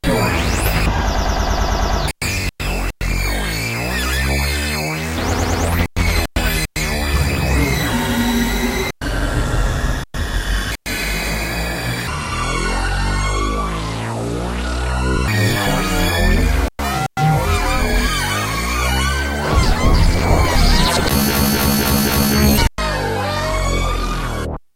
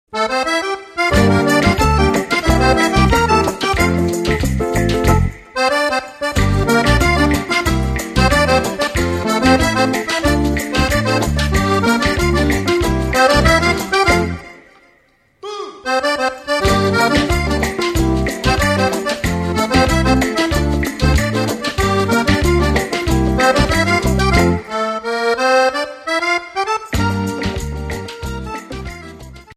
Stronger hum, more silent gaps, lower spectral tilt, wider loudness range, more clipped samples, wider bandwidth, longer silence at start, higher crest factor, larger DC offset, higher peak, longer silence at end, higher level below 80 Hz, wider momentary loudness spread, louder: neither; neither; about the same, -4.5 dB/octave vs -5 dB/octave; about the same, 5 LU vs 4 LU; neither; about the same, 16 kHz vs 16 kHz; about the same, 0.05 s vs 0.1 s; about the same, 16 dB vs 16 dB; neither; about the same, -2 dBFS vs 0 dBFS; about the same, 0.15 s vs 0.05 s; about the same, -22 dBFS vs -24 dBFS; about the same, 7 LU vs 8 LU; second, -18 LUFS vs -15 LUFS